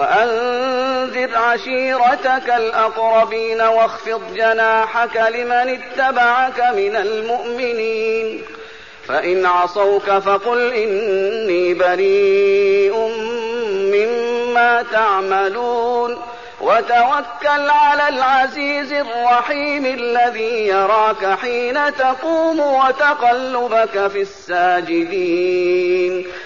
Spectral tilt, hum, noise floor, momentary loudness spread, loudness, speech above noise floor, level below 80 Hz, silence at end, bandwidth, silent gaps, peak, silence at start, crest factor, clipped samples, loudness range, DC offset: -1 dB/octave; none; -36 dBFS; 7 LU; -16 LUFS; 21 dB; -58 dBFS; 0 s; 7.2 kHz; none; -4 dBFS; 0 s; 12 dB; under 0.1%; 2 LU; 0.5%